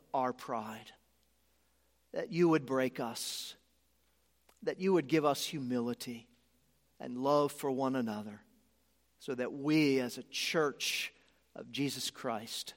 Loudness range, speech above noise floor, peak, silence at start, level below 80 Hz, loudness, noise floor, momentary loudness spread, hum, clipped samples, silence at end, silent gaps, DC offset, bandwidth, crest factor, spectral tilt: 2 LU; 40 dB; -16 dBFS; 0.15 s; -78 dBFS; -34 LUFS; -74 dBFS; 15 LU; none; under 0.1%; 0.05 s; none; under 0.1%; 16.5 kHz; 20 dB; -4.5 dB/octave